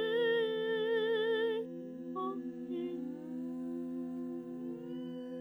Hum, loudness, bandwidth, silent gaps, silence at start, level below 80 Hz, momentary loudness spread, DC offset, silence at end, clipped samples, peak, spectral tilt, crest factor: none; -37 LUFS; over 20 kHz; none; 0 s; -84 dBFS; 11 LU; under 0.1%; 0 s; under 0.1%; -22 dBFS; -6.5 dB/octave; 14 dB